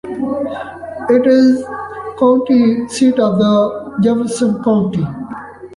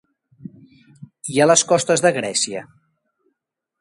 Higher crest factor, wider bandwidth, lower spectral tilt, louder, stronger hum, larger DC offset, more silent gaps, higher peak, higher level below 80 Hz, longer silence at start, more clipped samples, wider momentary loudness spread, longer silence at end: second, 12 dB vs 20 dB; about the same, 11.5 kHz vs 11.5 kHz; first, -6.5 dB/octave vs -3 dB/octave; first, -14 LUFS vs -17 LUFS; neither; neither; neither; about the same, -2 dBFS vs -2 dBFS; first, -50 dBFS vs -66 dBFS; second, 0.05 s vs 0.45 s; neither; about the same, 15 LU vs 14 LU; second, 0 s vs 1.2 s